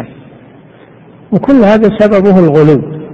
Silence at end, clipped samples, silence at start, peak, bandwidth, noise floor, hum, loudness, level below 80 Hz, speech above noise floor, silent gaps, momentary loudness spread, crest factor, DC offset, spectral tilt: 0 s; 1%; 0 s; 0 dBFS; 7.2 kHz; -37 dBFS; none; -7 LUFS; -40 dBFS; 31 dB; none; 8 LU; 10 dB; under 0.1%; -9 dB/octave